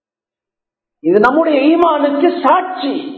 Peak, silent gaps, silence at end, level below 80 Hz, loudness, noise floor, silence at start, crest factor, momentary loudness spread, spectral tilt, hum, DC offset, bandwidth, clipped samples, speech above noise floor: 0 dBFS; none; 0 s; -54 dBFS; -13 LUFS; -88 dBFS; 1.05 s; 14 dB; 9 LU; -7 dB/octave; none; under 0.1%; 6.4 kHz; under 0.1%; 76 dB